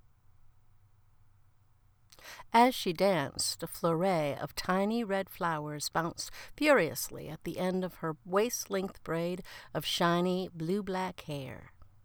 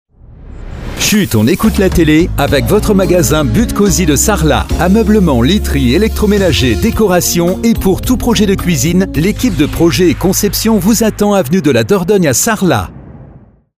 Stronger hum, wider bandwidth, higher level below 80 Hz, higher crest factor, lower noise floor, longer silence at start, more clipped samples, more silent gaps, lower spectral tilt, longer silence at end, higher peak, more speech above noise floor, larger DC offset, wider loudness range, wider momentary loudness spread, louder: neither; first, over 20 kHz vs 16 kHz; second, -60 dBFS vs -22 dBFS; first, 20 dB vs 10 dB; first, -64 dBFS vs -39 dBFS; first, 0.45 s vs 0.3 s; neither; neither; about the same, -4.5 dB/octave vs -5 dB/octave; second, 0.2 s vs 0.5 s; second, -12 dBFS vs 0 dBFS; first, 33 dB vs 29 dB; neither; about the same, 3 LU vs 1 LU; first, 14 LU vs 3 LU; second, -32 LUFS vs -10 LUFS